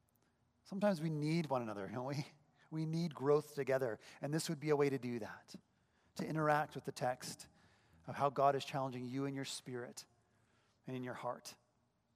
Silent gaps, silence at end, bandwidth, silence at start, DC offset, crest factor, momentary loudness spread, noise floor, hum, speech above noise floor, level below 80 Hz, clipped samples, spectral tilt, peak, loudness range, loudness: none; 0.6 s; 15.5 kHz; 0.65 s; under 0.1%; 22 dB; 17 LU; -79 dBFS; none; 40 dB; -84 dBFS; under 0.1%; -6 dB/octave; -20 dBFS; 3 LU; -40 LUFS